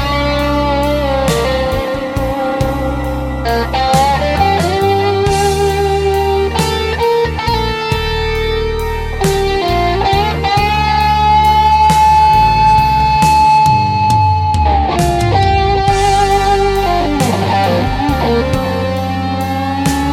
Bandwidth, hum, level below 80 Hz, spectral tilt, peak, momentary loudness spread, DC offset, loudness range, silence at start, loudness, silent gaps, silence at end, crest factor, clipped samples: 16.5 kHz; none; -22 dBFS; -5.5 dB/octave; 0 dBFS; 8 LU; under 0.1%; 6 LU; 0 s; -13 LUFS; none; 0 s; 12 dB; under 0.1%